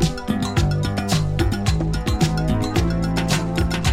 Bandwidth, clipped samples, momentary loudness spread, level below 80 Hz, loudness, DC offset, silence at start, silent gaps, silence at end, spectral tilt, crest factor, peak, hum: 16 kHz; under 0.1%; 2 LU; -28 dBFS; -21 LUFS; under 0.1%; 0 s; none; 0 s; -5.5 dB/octave; 14 dB; -4 dBFS; none